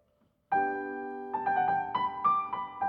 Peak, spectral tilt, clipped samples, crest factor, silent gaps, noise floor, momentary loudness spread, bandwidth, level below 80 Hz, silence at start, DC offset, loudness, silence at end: -16 dBFS; -7 dB/octave; under 0.1%; 14 dB; none; -71 dBFS; 8 LU; 5.2 kHz; -72 dBFS; 0.5 s; under 0.1%; -31 LUFS; 0 s